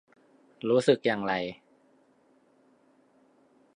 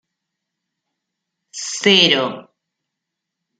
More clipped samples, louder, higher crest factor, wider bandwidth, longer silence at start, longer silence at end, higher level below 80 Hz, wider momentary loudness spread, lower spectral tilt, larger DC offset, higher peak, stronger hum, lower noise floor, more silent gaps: neither; second, -27 LUFS vs -14 LUFS; about the same, 24 dB vs 22 dB; about the same, 10.5 kHz vs 9.6 kHz; second, 0.65 s vs 1.55 s; first, 2.25 s vs 1.2 s; second, -74 dBFS vs -68 dBFS; about the same, 15 LU vs 17 LU; first, -5.5 dB/octave vs -2.5 dB/octave; neither; second, -8 dBFS vs 0 dBFS; neither; second, -65 dBFS vs -81 dBFS; neither